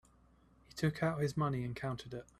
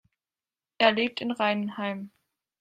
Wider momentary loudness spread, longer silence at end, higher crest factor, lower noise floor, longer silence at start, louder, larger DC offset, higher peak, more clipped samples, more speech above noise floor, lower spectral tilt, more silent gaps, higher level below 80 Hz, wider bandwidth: second, 8 LU vs 14 LU; second, 0.15 s vs 0.55 s; second, 18 dB vs 24 dB; second, -67 dBFS vs under -90 dBFS; about the same, 0.75 s vs 0.8 s; second, -37 LUFS vs -26 LUFS; neither; second, -20 dBFS vs -6 dBFS; neither; second, 30 dB vs over 64 dB; about the same, -7 dB/octave vs -6 dB/octave; neither; first, -62 dBFS vs -74 dBFS; first, 13.5 kHz vs 9.2 kHz